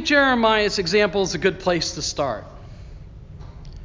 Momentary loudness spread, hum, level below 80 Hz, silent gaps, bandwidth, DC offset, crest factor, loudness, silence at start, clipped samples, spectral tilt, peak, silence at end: 24 LU; none; -42 dBFS; none; 7.6 kHz; under 0.1%; 18 dB; -20 LUFS; 0 s; under 0.1%; -3.5 dB/octave; -4 dBFS; 0 s